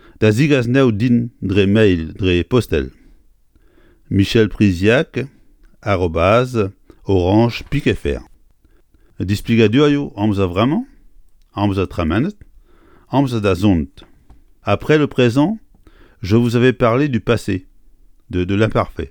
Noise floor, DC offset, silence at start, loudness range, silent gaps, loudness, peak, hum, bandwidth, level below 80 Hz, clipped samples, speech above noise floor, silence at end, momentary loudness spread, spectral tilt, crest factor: -52 dBFS; under 0.1%; 0.2 s; 3 LU; none; -16 LUFS; 0 dBFS; none; 18 kHz; -36 dBFS; under 0.1%; 37 dB; 0 s; 11 LU; -7 dB/octave; 16 dB